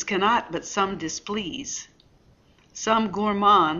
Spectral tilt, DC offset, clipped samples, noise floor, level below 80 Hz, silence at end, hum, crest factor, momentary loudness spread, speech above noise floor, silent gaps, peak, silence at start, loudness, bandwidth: -3.5 dB/octave; under 0.1%; under 0.1%; -58 dBFS; -56 dBFS; 0 s; none; 18 dB; 13 LU; 34 dB; none; -6 dBFS; 0 s; -24 LUFS; 7.6 kHz